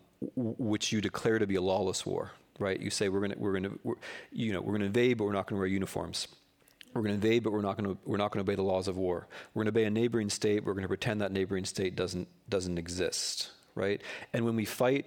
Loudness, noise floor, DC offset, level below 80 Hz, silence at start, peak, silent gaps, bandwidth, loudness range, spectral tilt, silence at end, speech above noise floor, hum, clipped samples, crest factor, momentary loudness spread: -32 LUFS; -59 dBFS; under 0.1%; -64 dBFS; 0.2 s; -14 dBFS; none; 18 kHz; 2 LU; -5 dB/octave; 0 s; 27 dB; none; under 0.1%; 18 dB; 8 LU